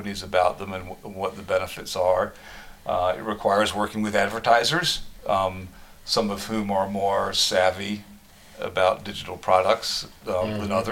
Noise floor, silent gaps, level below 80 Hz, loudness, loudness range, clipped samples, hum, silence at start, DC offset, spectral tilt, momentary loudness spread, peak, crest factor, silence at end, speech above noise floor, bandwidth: -47 dBFS; none; -50 dBFS; -24 LUFS; 2 LU; under 0.1%; none; 0 s; under 0.1%; -3.5 dB/octave; 14 LU; -4 dBFS; 22 dB; 0 s; 23 dB; 17 kHz